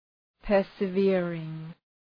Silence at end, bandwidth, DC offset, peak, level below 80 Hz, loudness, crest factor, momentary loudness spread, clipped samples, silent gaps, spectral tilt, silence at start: 0.45 s; 5.2 kHz; under 0.1%; -12 dBFS; -52 dBFS; -27 LUFS; 16 dB; 18 LU; under 0.1%; none; -9.5 dB/octave; 0.45 s